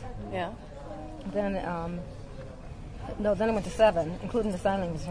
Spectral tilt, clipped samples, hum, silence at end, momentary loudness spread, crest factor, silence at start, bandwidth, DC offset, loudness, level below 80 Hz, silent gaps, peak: -6.5 dB/octave; under 0.1%; none; 0 s; 20 LU; 20 dB; 0 s; 11 kHz; under 0.1%; -30 LUFS; -44 dBFS; none; -10 dBFS